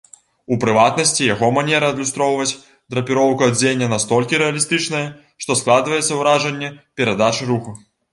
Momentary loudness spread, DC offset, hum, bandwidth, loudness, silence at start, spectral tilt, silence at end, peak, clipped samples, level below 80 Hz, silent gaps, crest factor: 9 LU; under 0.1%; none; 11.5 kHz; -17 LUFS; 0.5 s; -3.5 dB/octave; 0.35 s; 0 dBFS; under 0.1%; -56 dBFS; none; 18 dB